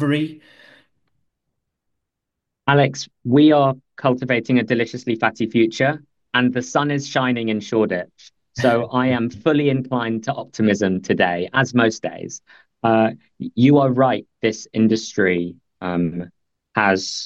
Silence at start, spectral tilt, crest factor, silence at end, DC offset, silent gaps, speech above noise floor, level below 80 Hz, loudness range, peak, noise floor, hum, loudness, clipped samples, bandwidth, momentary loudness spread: 0 s; -6 dB/octave; 18 dB; 0 s; under 0.1%; none; 62 dB; -60 dBFS; 3 LU; -2 dBFS; -81 dBFS; none; -19 LUFS; under 0.1%; 7.8 kHz; 13 LU